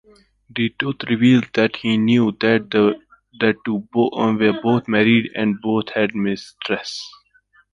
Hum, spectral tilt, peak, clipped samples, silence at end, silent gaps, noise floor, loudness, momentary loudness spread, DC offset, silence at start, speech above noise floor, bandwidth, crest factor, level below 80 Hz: none; -6.5 dB/octave; -2 dBFS; under 0.1%; 0.65 s; none; -57 dBFS; -19 LUFS; 9 LU; under 0.1%; 0.55 s; 39 dB; 7.4 kHz; 18 dB; -58 dBFS